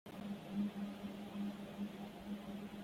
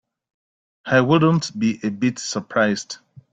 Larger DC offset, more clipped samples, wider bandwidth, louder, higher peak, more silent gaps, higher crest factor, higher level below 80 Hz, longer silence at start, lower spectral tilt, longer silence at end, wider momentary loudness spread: neither; neither; first, 16 kHz vs 9.2 kHz; second, -46 LUFS vs -20 LUFS; second, -30 dBFS vs -4 dBFS; neither; about the same, 16 dB vs 18 dB; second, -72 dBFS vs -60 dBFS; second, 0.05 s vs 0.85 s; first, -7 dB/octave vs -5.5 dB/octave; second, 0 s vs 0.4 s; second, 6 LU vs 15 LU